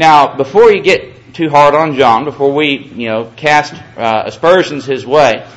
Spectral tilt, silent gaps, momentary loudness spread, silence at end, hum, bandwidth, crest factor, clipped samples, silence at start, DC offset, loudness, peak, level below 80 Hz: -5 dB/octave; none; 11 LU; 0.1 s; none; 11 kHz; 10 dB; 1%; 0 s; under 0.1%; -11 LUFS; 0 dBFS; -46 dBFS